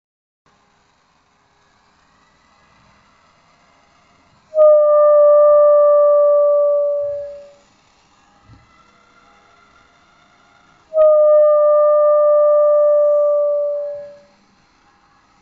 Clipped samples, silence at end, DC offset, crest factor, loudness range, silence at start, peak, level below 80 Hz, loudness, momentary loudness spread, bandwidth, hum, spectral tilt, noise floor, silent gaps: under 0.1%; 1.3 s; under 0.1%; 12 dB; 10 LU; 4.55 s; -4 dBFS; -66 dBFS; -13 LUFS; 13 LU; 2.2 kHz; none; -3 dB/octave; -58 dBFS; none